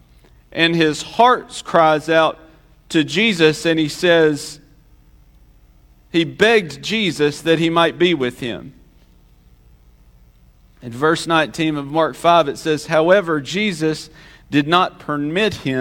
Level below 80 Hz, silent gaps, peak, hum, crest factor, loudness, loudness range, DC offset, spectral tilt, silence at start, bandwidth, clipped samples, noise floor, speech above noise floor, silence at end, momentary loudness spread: -50 dBFS; none; 0 dBFS; none; 18 dB; -17 LUFS; 6 LU; under 0.1%; -5 dB/octave; 0.55 s; 16.5 kHz; under 0.1%; -50 dBFS; 33 dB; 0 s; 8 LU